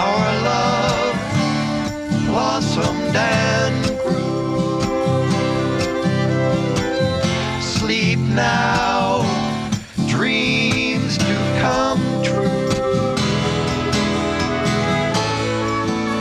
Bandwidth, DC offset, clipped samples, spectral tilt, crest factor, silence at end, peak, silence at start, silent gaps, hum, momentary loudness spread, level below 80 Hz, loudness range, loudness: 13 kHz; under 0.1%; under 0.1%; -5 dB/octave; 12 dB; 0 s; -6 dBFS; 0 s; none; none; 4 LU; -40 dBFS; 1 LU; -19 LUFS